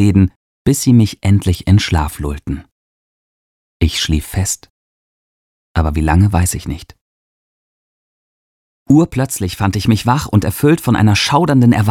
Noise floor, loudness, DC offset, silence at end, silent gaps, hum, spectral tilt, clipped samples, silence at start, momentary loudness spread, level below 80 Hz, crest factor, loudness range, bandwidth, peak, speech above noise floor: under -90 dBFS; -14 LUFS; under 0.1%; 0 s; 0.36-0.65 s, 2.72-3.80 s, 4.70-5.75 s, 7.01-8.86 s; none; -5.5 dB/octave; under 0.1%; 0 s; 11 LU; -32 dBFS; 14 dB; 7 LU; 16.5 kHz; 0 dBFS; over 77 dB